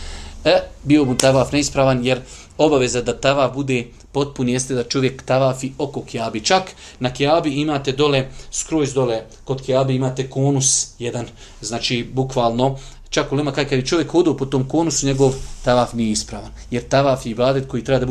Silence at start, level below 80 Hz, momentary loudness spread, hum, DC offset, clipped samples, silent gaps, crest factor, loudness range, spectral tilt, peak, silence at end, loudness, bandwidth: 0 s; -40 dBFS; 10 LU; none; under 0.1%; under 0.1%; none; 18 dB; 3 LU; -4.5 dB/octave; 0 dBFS; 0 s; -19 LUFS; 14 kHz